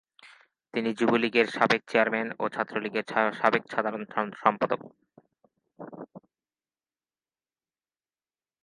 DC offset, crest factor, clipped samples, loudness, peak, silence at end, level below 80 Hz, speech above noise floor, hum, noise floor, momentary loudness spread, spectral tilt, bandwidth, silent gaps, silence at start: under 0.1%; 26 dB; under 0.1%; -27 LUFS; -4 dBFS; 2.45 s; -76 dBFS; over 63 dB; none; under -90 dBFS; 19 LU; -5.5 dB/octave; 11.5 kHz; none; 0.25 s